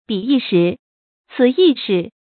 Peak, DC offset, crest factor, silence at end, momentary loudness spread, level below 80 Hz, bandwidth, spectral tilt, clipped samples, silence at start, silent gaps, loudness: -2 dBFS; under 0.1%; 14 dB; 0.2 s; 11 LU; -64 dBFS; 4.6 kHz; -11.5 dB/octave; under 0.1%; 0.1 s; 0.79-1.24 s; -16 LUFS